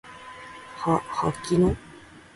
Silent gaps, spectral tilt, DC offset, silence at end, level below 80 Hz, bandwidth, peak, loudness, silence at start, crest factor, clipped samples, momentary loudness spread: none; -6.5 dB/octave; under 0.1%; 0.15 s; -44 dBFS; 11.5 kHz; -10 dBFS; -25 LUFS; 0.05 s; 18 dB; under 0.1%; 19 LU